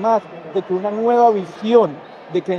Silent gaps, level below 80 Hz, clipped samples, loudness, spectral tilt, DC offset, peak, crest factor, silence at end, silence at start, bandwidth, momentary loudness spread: none; -72 dBFS; under 0.1%; -18 LUFS; -7 dB/octave; under 0.1%; 0 dBFS; 16 dB; 0 s; 0 s; 6.8 kHz; 11 LU